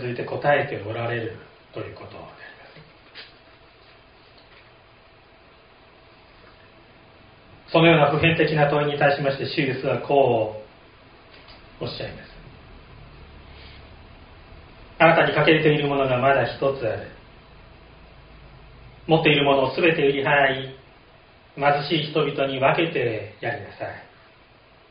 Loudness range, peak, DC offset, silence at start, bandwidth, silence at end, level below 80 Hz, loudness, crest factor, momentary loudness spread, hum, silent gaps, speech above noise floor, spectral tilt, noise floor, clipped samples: 19 LU; -2 dBFS; under 0.1%; 0 s; 5.2 kHz; 0.85 s; -52 dBFS; -21 LUFS; 22 dB; 24 LU; none; none; 32 dB; -3.5 dB/octave; -53 dBFS; under 0.1%